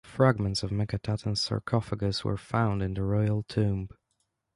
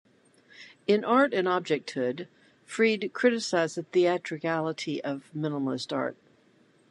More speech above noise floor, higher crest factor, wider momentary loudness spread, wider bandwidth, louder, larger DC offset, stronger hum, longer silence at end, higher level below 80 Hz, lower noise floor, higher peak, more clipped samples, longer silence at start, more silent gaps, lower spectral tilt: first, 50 dB vs 35 dB; about the same, 20 dB vs 20 dB; second, 6 LU vs 11 LU; about the same, 11.5 kHz vs 11.5 kHz; about the same, -29 LUFS vs -28 LUFS; neither; neither; about the same, 0.7 s vs 0.75 s; first, -48 dBFS vs -80 dBFS; first, -78 dBFS vs -62 dBFS; about the same, -8 dBFS vs -8 dBFS; neither; second, 0.05 s vs 0.6 s; neither; first, -6.5 dB/octave vs -5 dB/octave